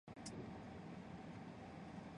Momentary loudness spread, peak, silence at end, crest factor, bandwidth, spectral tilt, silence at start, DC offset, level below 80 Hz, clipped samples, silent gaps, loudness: 2 LU; -40 dBFS; 0 s; 14 dB; 10 kHz; -5.5 dB/octave; 0.05 s; under 0.1%; -70 dBFS; under 0.1%; none; -54 LUFS